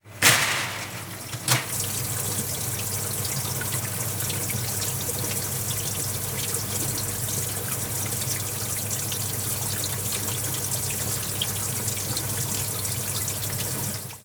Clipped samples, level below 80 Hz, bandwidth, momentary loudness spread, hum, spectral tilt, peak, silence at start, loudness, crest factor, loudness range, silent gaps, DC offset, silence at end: under 0.1%; -50 dBFS; over 20 kHz; 3 LU; none; -2 dB/octave; -4 dBFS; 0.05 s; -25 LUFS; 24 dB; 1 LU; none; under 0.1%; 0 s